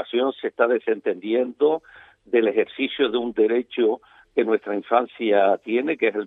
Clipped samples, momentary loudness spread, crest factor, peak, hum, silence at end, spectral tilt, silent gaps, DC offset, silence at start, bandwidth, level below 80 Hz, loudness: under 0.1%; 5 LU; 18 dB; -4 dBFS; none; 0 s; -7.5 dB/octave; none; under 0.1%; 0 s; 4 kHz; -68 dBFS; -22 LUFS